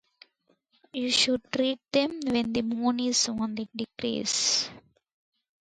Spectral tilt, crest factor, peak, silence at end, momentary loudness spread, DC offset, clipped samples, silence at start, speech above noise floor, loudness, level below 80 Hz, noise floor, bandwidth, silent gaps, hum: -2 dB/octave; 18 dB; -10 dBFS; 0.8 s; 10 LU; under 0.1%; under 0.1%; 0.95 s; 43 dB; -27 LUFS; -64 dBFS; -70 dBFS; 10.5 kHz; none; none